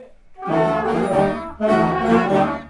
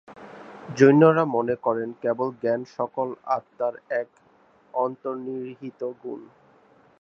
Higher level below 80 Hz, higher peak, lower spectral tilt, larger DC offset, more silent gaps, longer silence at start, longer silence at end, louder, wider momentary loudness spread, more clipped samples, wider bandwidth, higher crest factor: first, -44 dBFS vs -72 dBFS; about the same, -4 dBFS vs -2 dBFS; about the same, -7.5 dB/octave vs -7.5 dB/octave; neither; neither; about the same, 0 s vs 0.1 s; second, 0 s vs 0.75 s; first, -19 LUFS vs -24 LUFS; second, 7 LU vs 21 LU; neither; first, 11.5 kHz vs 7.6 kHz; second, 16 dB vs 22 dB